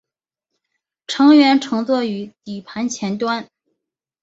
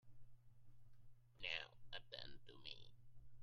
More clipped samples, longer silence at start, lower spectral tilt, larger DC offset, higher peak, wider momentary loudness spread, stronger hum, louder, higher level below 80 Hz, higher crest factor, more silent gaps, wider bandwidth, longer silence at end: neither; first, 1.1 s vs 0.05 s; first, -4.5 dB/octave vs -3 dB/octave; neither; first, -2 dBFS vs -30 dBFS; first, 18 LU vs 12 LU; neither; first, -17 LUFS vs -52 LUFS; about the same, -66 dBFS vs -70 dBFS; second, 18 dB vs 24 dB; neither; second, 7.8 kHz vs 11 kHz; first, 0.8 s vs 0 s